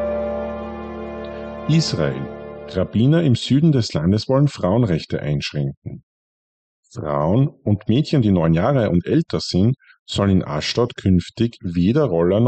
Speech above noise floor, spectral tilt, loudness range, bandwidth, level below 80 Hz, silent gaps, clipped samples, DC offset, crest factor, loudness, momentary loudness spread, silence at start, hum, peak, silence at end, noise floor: over 72 dB; -7 dB/octave; 4 LU; 8.8 kHz; -44 dBFS; 5.77-5.82 s, 6.03-6.83 s, 9.99-10.06 s; under 0.1%; under 0.1%; 12 dB; -19 LUFS; 14 LU; 0 s; none; -6 dBFS; 0 s; under -90 dBFS